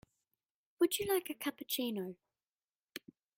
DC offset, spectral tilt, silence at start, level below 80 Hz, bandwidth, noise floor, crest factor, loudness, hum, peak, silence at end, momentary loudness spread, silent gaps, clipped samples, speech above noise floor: under 0.1%; -3 dB/octave; 0.8 s; -76 dBFS; 16.5 kHz; under -90 dBFS; 20 dB; -36 LUFS; none; -20 dBFS; 0.4 s; 17 LU; 2.47-2.51 s, 2.64-2.80 s; under 0.1%; over 53 dB